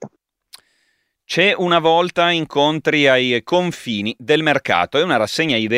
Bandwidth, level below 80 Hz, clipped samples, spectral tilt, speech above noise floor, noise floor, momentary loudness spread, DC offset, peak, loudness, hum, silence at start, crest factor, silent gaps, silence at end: 15.5 kHz; -60 dBFS; under 0.1%; -4.5 dB/octave; 50 dB; -66 dBFS; 8 LU; under 0.1%; 0 dBFS; -16 LUFS; none; 0 s; 18 dB; none; 0 s